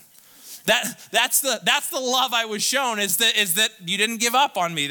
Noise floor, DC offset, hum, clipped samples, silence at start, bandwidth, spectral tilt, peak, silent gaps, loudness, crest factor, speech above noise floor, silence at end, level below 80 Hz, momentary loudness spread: -48 dBFS; under 0.1%; none; under 0.1%; 0.45 s; 19 kHz; -0.5 dB/octave; -6 dBFS; none; -20 LUFS; 16 dB; 26 dB; 0 s; -70 dBFS; 4 LU